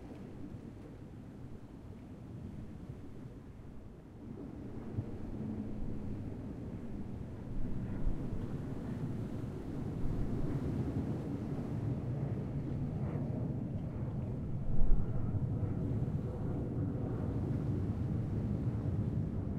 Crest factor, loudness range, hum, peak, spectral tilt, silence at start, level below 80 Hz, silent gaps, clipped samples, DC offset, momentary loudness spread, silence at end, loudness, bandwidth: 22 dB; 12 LU; none; -14 dBFS; -10 dB/octave; 0 s; -42 dBFS; none; under 0.1%; under 0.1%; 14 LU; 0 s; -39 LUFS; 4.8 kHz